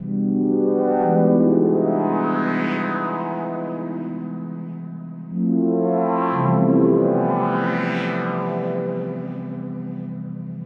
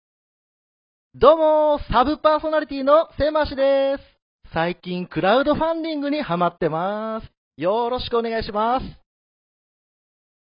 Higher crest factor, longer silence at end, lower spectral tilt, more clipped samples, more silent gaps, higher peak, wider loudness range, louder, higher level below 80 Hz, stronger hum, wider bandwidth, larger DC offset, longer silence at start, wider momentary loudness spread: second, 16 dB vs 22 dB; second, 0 s vs 1.55 s; about the same, -10 dB/octave vs -10.5 dB/octave; neither; second, none vs 4.22-4.39 s, 7.37-7.51 s; second, -4 dBFS vs 0 dBFS; about the same, 6 LU vs 7 LU; about the same, -21 LUFS vs -20 LUFS; second, -74 dBFS vs -42 dBFS; neither; about the same, 5.8 kHz vs 5.4 kHz; neither; second, 0 s vs 1.15 s; first, 14 LU vs 10 LU